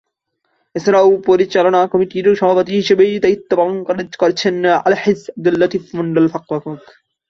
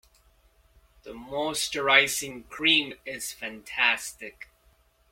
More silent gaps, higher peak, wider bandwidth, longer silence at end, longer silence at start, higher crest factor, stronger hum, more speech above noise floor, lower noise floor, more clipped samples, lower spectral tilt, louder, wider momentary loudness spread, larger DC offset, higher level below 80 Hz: neither; about the same, -2 dBFS vs -4 dBFS; second, 7.2 kHz vs 16.5 kHz; second, 0.5 s vs 0.7 s; second, 0.75 s vs 1.05 s; second, 14 dB vs 26 dB; neither; first, 55 dB vs 36 dB; first, -69 dBFS vs -63 dBFS; neither; first, -6 dB/octave vs -1 dB/octave; first, -15 LUFS vs -24 LUFS; second, 10 LU vs 20 LU; neither; about the same, -58 dBFS vs -62 dBFS